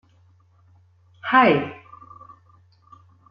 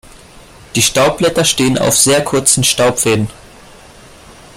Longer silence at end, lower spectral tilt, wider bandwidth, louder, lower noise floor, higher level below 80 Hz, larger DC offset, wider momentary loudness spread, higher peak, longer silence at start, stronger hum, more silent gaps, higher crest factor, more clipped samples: first, 1.55 s vs 0.25 s; first, -8 dB/octave vs -3 dB/octave; second, 5.4 kHz vs 16.5 kHz; second, -19 LUFS vs -11 LUFS; first, -57 dBFS vs -39 dBFS; second, -68 dBFS vs -42 dBFS; neither; first, 27 LU vs 5 LU; second, -4 dBFS vs 0 dBFS; first, 1.25 s vs 0.35 s; neither; neither; first, 22 dB vs 14 dB; neither